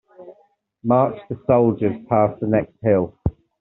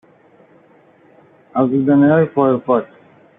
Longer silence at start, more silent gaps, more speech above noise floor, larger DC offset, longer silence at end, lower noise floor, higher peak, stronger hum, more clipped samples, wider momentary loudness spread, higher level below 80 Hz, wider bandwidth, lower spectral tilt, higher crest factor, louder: second, 0.2 s vs 1.55 s; neither; first, 41 dB vs 36 dB; neither; second, 0.3 s vs 0.55 s; first, -60 dBFS vs -50 dBFS; about the same, -2 dBFS vs -2 dBFS; neither; neither; about the same, 11 LU vs 9 LU; first, -44 dBFS vs -62 dBFS; about the same, 4.1 kHz vs 3.8 kHz; second, -9.5 dB/octave vs -11.5 dB/octave; about the same, 18 dB vs 14 dB; second, -20 LUFS vs -15 LUFS